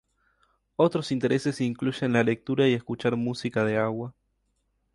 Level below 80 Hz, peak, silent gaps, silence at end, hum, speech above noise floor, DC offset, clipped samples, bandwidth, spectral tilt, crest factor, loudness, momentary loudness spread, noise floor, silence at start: -64 dBFS; -8 dBFS; none; 0.85 s; none; 48 dB; under 0.1%; under 0.1%; 11.5 kHz; -6.5 dB/octave; 20 dB; -26 LUFS; 5 LU; -73 dBFS; 0.8 s